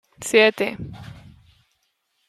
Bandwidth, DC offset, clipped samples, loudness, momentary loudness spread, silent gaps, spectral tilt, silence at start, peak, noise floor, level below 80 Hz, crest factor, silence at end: 14 kHz; under 0.1%; under 0.1%; -19 LUFS; 24 LU; none; -3.5 dB/octave; 0.2 s; -4 dBFS; -71 dBFS; -56 dBFS; 20 dB; 1.15 s